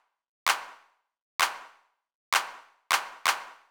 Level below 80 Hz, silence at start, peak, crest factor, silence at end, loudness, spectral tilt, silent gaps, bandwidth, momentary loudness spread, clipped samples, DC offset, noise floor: -74 dBFS; 0.45 s; -8 dBFS; 24 dB; 0.15 s; -29 LUFS; 2.5 dB/octave; 1.22-1.39 s, 2.15-2.32 s; over 20 kHz; 12 LU; under 0.1%; under 0.1%; -62 dBFS